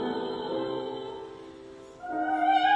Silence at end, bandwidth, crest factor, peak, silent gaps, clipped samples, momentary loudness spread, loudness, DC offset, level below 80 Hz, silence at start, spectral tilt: 0 s; 8.4 kHz; 18 dB; -12 dBFS; none; under 0.1%; 21 LU; -30 LUFS; under 0.1%; -66 dBFS; 0 s; -5 dB/octave